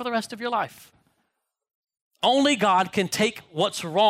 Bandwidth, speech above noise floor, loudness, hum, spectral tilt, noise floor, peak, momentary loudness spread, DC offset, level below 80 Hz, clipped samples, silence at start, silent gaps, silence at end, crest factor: 16 kHz; 55 dB; -24 LUFS; none; -3.5 dB/octave; -78 dBFS; -10 dBFS; 8 LU; under 0.1%; -68 dBFS; under 0.1%; 0 s; 1.75-1.83 s, 2.02-2.11 s; 0 s; 16 dB